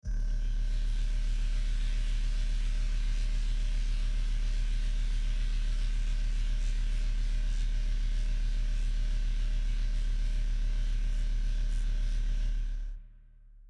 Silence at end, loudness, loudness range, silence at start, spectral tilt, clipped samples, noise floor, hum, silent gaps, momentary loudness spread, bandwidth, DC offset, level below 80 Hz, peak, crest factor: 0 s; -35 LUFS; 0 LU; 0.05 s; -4.5 dB/octave; under 0.1%; -53 dBFS; none; none; 0 LU; 8.4 kHz; under 0.1%; -28 dBFS; -22 dBFS; 6 dB